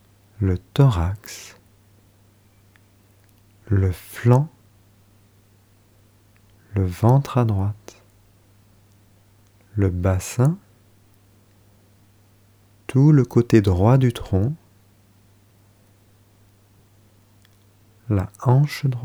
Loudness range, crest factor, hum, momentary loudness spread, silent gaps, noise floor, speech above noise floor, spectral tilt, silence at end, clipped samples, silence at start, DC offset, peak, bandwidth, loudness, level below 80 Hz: 7 LU; 20 dB; none; 16 LU; none; -56 dBFS; 37 dB; -8 dB/octave; 0 s; under 0.1%; 0.4 s; under 0.1%; -2 dBFS; 20 kHz; -20 LUFS; -46 dBFS